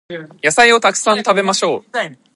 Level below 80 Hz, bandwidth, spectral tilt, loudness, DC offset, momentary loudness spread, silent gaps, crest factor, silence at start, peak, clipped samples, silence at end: -62 dBFS; 11.5 kHz; -2 dB/octave; -14 LUFS; under 0.1%; 13 LU; none; 16 dB; 0.1 s; 0 dBFS; under 0.1%; 0.2 s